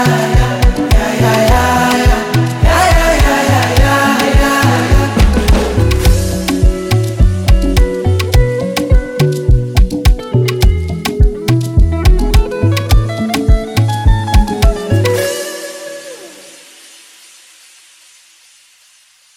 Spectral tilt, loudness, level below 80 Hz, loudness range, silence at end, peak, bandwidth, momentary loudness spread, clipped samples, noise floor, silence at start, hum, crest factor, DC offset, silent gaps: -5.5 dB/octave; -12 LUFS; -14 dBFS; 6 LU; 2.95 s; 0 dBFS; 17.5 kHz; 5 LU; under 0.1%; -48 dBFS; 0 s; none; 10 dB; under 0.1%; none